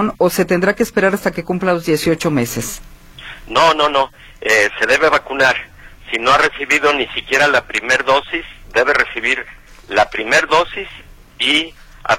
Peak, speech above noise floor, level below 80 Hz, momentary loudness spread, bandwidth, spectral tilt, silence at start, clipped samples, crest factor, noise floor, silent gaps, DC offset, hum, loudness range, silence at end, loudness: 0 dBFS; 20 dB; -42 dBFS; 11 LU; 16.5 kHz; -3.5 dB/octave; 0 s; under 0.1%; 16 dB; -35 dBFS; none; under 0.1%; none; 3 LU; 0 s; -15 LUFS